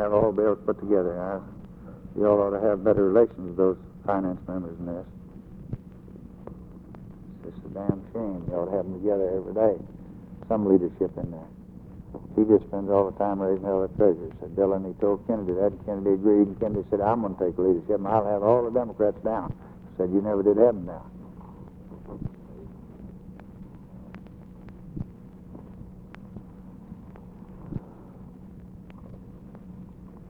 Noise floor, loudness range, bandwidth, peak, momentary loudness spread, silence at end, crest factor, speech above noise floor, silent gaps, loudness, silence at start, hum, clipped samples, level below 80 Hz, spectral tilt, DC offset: -45 dBFS; 19 LU; 3.9 kHz; -6 dBFS; 24 LU; 0 s; 20 dB; 21 dB; none; -25 LUFS; 0 s; none; under 0.1%; -50 dBFS; -11.5 dB/octave; under 0.1%